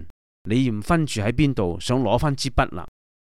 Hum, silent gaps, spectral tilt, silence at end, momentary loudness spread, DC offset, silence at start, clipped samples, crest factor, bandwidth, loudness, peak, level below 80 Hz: none; 0.10-0.45 s; -6 dB/octave; 0.5 s; 5 LU; 2%; 0 s; under 0.1%; 18 dB; 14 kHz; -22 LUFS; -4 dBFS; -36 dBFS